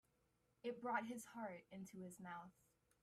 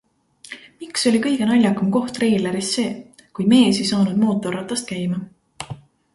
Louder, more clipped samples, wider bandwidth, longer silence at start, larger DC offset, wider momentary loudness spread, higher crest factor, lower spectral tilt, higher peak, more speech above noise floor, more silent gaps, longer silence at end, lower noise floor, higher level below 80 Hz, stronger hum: second, -51 LUFS vs -19 LUFS; neither; first, 15.5 kHz vs 11.5 kHz; first, 0.65 s vs 0.5 s; neither; second, 12 LU vs 20 LU; about the same, 22 dB vs 18 dB; about the same, -5 dB/octave vs -5 dB/octave; second, -30 dBFS vs -2 dBFS; about the same, 32 dB vs 30 dB; neither; about the same, 0.5 s vs 0.4 s; first, -83 dBFS vs -48 dBFS; second, -88 dBFS vs -58 dBFS; neither